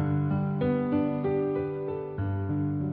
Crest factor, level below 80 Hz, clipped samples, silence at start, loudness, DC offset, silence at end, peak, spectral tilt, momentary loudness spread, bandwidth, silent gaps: 12 dB; -56 dBFS; under 0.1%; 0 s; -29 LUFS; under 0.1%; 0 s; -16 dBFS; -9.5 dB/octave; 6 LU; 4.3 kHz; none